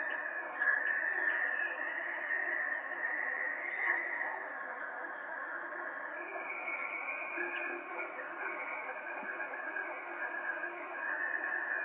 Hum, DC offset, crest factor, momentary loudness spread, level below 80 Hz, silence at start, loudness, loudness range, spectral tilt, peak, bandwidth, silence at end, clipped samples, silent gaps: none; under 0.1%; 18 dB; 9 LU; under -90 dBFS; 0 s; -36 LUFS; 6 LU; 0.5 dB/octave; -18 dBFS; 3.9 kHz; 0 s; under 0.1%; none